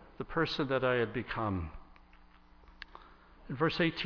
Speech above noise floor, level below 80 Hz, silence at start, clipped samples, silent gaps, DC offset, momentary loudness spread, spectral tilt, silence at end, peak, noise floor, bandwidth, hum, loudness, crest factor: 26 dB; -54 dBFS; 0 s; under 0.1%; none; under 0.1%; 21 LU; -7 dB/octave; 0 s; -16 dBFS; -59 dBFS; 5.4 kHz; none; -33 LUFS; 20 dB